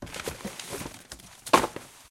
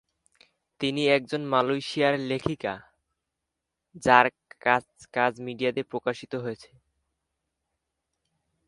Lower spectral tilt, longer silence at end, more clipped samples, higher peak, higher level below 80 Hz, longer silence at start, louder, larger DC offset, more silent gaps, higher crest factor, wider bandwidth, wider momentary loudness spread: second, -3 dB/octave vs -5 dB/octave; second, 0.05 s vs 2.05 s; neither; about the same, -2 dBFS vs 0 dBFS; first, -54 dBFS vs -64 dBFS; second, 0 s vs 0.8 s; second, -29 LUFS vs -26 LUFS; neither; neither; about the same, 30 dB vs 28 dB; first, 16.5 kHz vs 11.5 kHz; first, 20 LU vs 14 LU